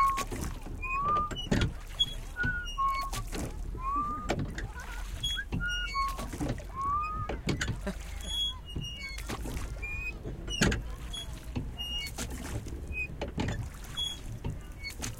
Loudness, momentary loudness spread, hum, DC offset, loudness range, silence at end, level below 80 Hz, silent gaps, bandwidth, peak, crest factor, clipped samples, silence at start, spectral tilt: -34 LUFS; 10 LU; none; under 0.1%; 4 LU; 0 s; -40 dBFS; none; 17 kHz; -12 dBFS; 22 dB; under 0.1%; 0 s; -4 dB/octave